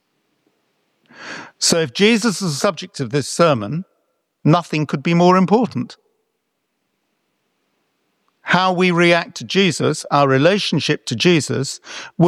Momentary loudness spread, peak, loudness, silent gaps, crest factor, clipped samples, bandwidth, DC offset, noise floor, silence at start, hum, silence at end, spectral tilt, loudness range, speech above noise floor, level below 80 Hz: 15 LU; -2 dBFS; -17 LUFS; none; 18 dB; under 0.1%; 13.5 kHz; under 0.1%; -72 dBFS; 1.2 s; none; 0 s; -4.5 dB/octave; 5 LU; 56 dB; -62 dBFS